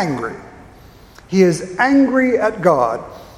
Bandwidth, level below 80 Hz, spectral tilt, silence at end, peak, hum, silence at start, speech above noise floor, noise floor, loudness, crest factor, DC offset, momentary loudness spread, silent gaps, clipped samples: 12.5 kHz; -48 dBFS; -6.5 dB/octave; 0.15 s; 0 dBFS; none; 0 s; 27 dB; -43 dBFS; -16 LUFS; 18 dB; under 0.1%; 13 LU; none; under 0.1%